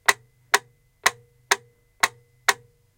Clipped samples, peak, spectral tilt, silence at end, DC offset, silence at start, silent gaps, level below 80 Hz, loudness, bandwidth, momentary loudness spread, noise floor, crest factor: under 0.1%; 0 dBFS; 1 dB/octave; 0.45 s; under 0.1%; 0.1 s; none; -62 dBFS; -25 LUFS; 17 kHz; 1 LU; -40 dBFS; 26 dB